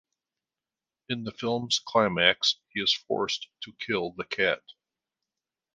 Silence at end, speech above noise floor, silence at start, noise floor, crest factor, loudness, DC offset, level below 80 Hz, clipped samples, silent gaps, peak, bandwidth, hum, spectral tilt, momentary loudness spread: 1.15 s; over 62 dB; 1.1 s; under -90 dBFS; 24 dB; -27 LUFS; under 0.1%; -66 dBFS; under 0.1%; none; -6 dBFS; 10 kHz; none; -3 dB/octave; 13 LU